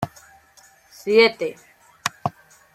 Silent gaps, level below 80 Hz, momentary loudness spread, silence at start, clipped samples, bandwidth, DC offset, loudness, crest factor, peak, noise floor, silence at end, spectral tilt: none; -66 dBFS; 16 LU; 0 s; under 0.1%; 14.5 kHz; under 0.1%; -21 LUFS; 22 dB; -2 dBFS; -53 dBFS; 0.45 s; -3.5 dB/octave